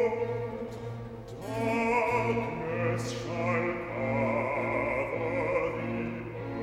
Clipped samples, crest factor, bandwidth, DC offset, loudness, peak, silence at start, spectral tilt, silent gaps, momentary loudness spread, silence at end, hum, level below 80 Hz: under 0.1%; 16 dB; 14 kHz; under 0.1%; -31 LUFS; -16 dBFS; 0 s; -6.5 dB/octave; none; 11 LU; 0 s; none; -54 dBFS